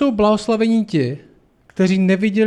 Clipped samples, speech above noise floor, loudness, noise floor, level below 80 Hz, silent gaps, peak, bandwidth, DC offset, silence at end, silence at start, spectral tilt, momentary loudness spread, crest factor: under 0.1%; 34 dB; -17 LUFS; -50 dBFS; -48 dBFS; none; -4 dBFS; 10 kHz; under 0.1%; 0 s; 0 s; -7 dB/octave; 11 LU; 12 dB